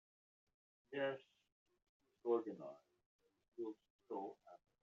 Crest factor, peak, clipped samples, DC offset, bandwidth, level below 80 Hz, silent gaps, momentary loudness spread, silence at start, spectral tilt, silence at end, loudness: 22 dB; -26 dBFS; under 0.1%; under 0.1%; 7 kHz; under -90 dBFS; 1.52-1.66 s, 1.89-2.00 s, 3.06-3.19 s, 3.48-3.52 s, 3.90-3.99 s; 21 LU; 0.9 s; -4 dB/octave; 0.35 s; -47 LUFS